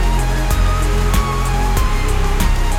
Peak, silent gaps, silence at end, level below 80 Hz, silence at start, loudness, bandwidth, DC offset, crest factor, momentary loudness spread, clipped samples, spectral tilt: -2 dBFS; none; 0 s; -16 dBFS; 0 s; -18 LUFS; 16 kHz; under 0.1%; 12 dB; 2 LU; under 0.1%; -5 dB/octave